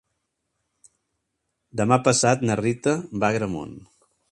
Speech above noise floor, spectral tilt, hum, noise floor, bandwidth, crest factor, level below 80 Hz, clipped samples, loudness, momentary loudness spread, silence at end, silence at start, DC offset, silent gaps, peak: 56 dB; -5 dB/octave; none; -78 dBFS; 11.5 kHz; 22 dB; -56 dBFS; under 0.1%; -22 LUFS; 14 LU; 0.5 s; 1.75 s; under 0.1%; none; -2 dBFS